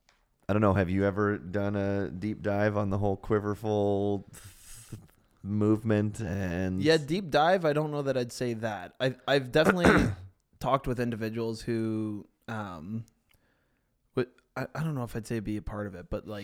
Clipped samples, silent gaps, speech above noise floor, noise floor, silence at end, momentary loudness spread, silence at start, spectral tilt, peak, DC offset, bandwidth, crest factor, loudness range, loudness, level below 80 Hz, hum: under 0.1%; none; 45 dB; -73 dBFS; 0 s; 14 LU; 0.5 s; -6.5 dB/octave; -6 dBFS; under 0.1%; 16 kHz; 24 dB; 9 LU; -29 LUFS; -50 dBFS; none